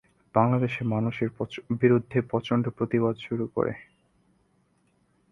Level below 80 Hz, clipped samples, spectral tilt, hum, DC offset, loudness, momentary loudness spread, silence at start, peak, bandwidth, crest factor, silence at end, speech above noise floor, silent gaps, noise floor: -62 dBFS; under 0.1%; -9 dB/octave; none; under 0.1%; -27 LUFS; 8 LU; 0.35 s; -6 dBFS; 6.6 kHz; 22 dB; 1.5 s; 42 dB; none; -68 dBFS